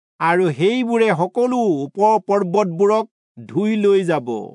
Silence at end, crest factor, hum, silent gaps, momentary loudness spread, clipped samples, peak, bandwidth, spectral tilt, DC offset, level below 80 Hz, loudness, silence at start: 0 s; 14 dB; none; 3.11-3.35 s; 5 LU; under 0.1%; -4 dBFS; 10.5 kHz; -6.5 dB/octave; under 0.1%; -76 dBFS; -18 LUFS; 0.2 s